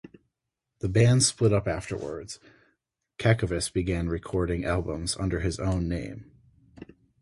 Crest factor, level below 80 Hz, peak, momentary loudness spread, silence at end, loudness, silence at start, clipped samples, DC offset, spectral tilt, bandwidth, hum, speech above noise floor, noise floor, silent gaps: 22 dB; -42 dBFS; -6 dBFS; 17 LU; 0.4 s; -27 LUFS; 0.05 s; under 0.1%; under 0.1%; -5 dB/octave; 11.5 kHz; none; 57 dB; -83 dBFS; none